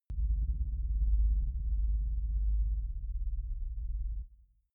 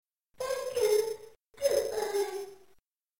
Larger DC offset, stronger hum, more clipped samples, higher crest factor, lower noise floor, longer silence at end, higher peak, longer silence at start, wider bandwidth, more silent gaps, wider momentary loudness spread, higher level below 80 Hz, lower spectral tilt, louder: neither; neither; neither; second, 12 dB vs 18 dB; second, -58 dBFS vs -67 dBFS; second, 0.4 s vs 0.65 s; second, -20 dBFS vs -14 dBFS; second, 0.1 s vs 0.4 s; second, 0.4 kHz vs 17 kHz; neither; second, 9 LU vs 14 LU; first, -32 dBFS vs -68 dBFS; first, -12 dB/octave vs -2 dB/octave; second, -36 LUFS vs -31 LUFS